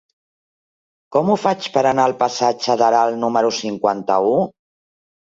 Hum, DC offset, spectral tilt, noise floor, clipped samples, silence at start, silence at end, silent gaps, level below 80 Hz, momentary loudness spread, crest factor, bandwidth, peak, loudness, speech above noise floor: none; under 0.1%; -4.5 dB/octave; under -90 dBFS; under 0.1%; 1.1 s; 0.7 s; none; -64 dBFS; 5 LU; 16 dB; 7.8 kHz; -2 dBFS; -18 LUFS; over 73 dB